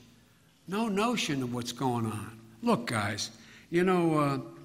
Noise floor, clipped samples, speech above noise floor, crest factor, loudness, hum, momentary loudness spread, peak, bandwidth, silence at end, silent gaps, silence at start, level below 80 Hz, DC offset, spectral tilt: -62 dBFS; under 0.1%; 32 dB; 18 dB; -30 LUFS; none; 10 LU; -14 dBFS; 16 kHz; 0 s; none; 0.7 s; -66 dBFS; under 0.1%; -5 dB/octave